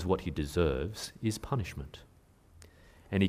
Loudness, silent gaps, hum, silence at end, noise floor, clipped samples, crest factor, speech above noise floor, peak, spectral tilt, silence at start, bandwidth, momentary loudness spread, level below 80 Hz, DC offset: -34 LUFS; none; none; 0 s; -60 dBFS; under 0.1%; 20 dB; 27 dB; -14 dBFS; -6 dB/octave; 0 s; 15.5 kHz; 15 LU; -46 dBFS; under 0.1%